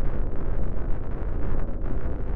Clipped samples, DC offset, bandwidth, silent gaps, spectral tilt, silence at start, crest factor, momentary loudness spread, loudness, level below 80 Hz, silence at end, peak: under 0.1%; under 0.1%; 2.7 kHz; none; -11 dB/octave; 0 s; 10 dB; 2 LU; -32 LUFS; -26 dBFS; 0 s; -10 dBFS